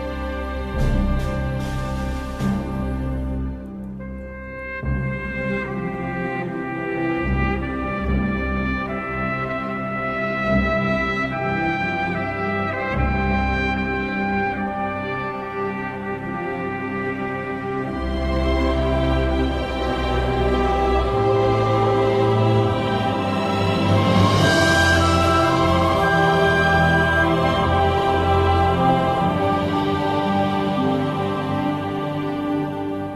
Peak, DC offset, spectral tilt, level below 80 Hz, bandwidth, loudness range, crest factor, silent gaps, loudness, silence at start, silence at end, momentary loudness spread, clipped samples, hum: -4 dBFS; under 0.1%; -6.5 dB/octave; -30 dBFS; 14.5 kHz; 9 LU; 16 dB; none; -21 LUFS; 0 s; 0 s; 10 LU; under 0.1%; none